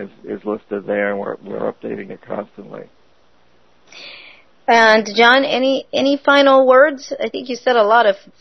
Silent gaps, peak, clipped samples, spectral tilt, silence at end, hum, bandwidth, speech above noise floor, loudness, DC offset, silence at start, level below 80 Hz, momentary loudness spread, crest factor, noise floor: none; 0 dBFS; under 0.1%; -3.5 dB/octave; 0.25 s; none; 6.4 kHz; 41 dB; -15 LUFS; 0.3%; 0 s; -64 dBFS; 19 LU; 16 dB; -57 dBFS